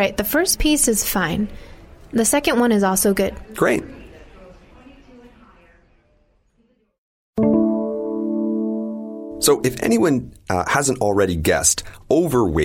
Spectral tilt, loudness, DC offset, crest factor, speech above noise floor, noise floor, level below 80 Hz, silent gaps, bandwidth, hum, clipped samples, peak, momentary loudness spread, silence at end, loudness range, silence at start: -4 dB/octave; -19 LUFS; under 0.1%; 18 dB; 44 dB; -62 dBFS; -38 dBFS; 6.98-7.33 s; 16.5 kHz; none; under 0.1%; -2 dBFS; 9 LU; 0 s; 8 LU; 0 s